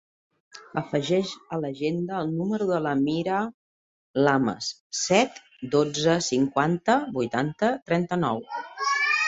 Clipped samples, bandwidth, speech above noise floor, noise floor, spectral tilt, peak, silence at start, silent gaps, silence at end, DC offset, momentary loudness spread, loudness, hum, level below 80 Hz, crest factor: under 0.1%; 8 kHz; over 65 dB; under -90 dBFS; -4.5 dB/octave; -6 dBFS; 0.55 s; 3.54-4.14 s, 4.80-4.90 s, 7.82-7.86 s; 0 s; under 0.1%; 10 LU; -25 LUFS; none; -64 dBFS; 20 dB